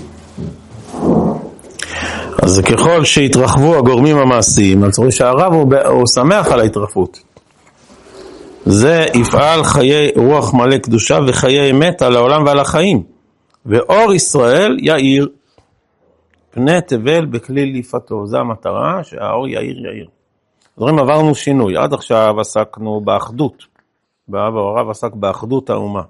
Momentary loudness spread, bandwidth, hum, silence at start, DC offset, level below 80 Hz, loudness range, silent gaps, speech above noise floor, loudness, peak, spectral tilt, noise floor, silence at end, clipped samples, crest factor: 11 LU; 12 kHz; none; 0 s; under 0.1%; -40 dBFS; 8 LU; none; 51 dB; -12 LUFS; 0 dBFS; -5 dB/octave; -62 dBFS; 0.05 s; under 0.1%; 12 dB